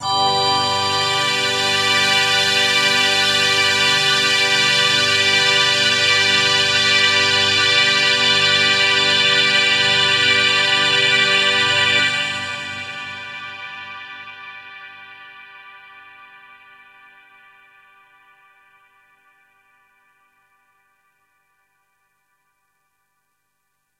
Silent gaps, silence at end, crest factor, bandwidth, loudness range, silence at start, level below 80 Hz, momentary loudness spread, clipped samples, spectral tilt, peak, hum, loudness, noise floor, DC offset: none; 8.25 s; 18 dB; 16 kHz; 16 LU; 0 s; -64 dBFS; 17 LU; under 0.1%; -1 dB/octave; -2 dBFS; 50 Hz at -50 dBFS; -14 LUFS; -72 dBFS; under 0.1%